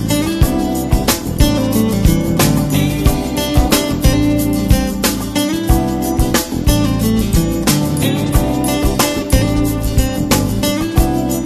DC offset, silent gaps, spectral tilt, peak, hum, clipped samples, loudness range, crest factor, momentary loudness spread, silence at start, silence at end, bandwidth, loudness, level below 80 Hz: under 0.1%; none; -5 dB/octave; 0 dBFS; none; under 0.1%; 1 LU; 14 dB; 3 LU; 0 s; 0 s; 14.5 kHz; -15 LUFS; -20 dBFS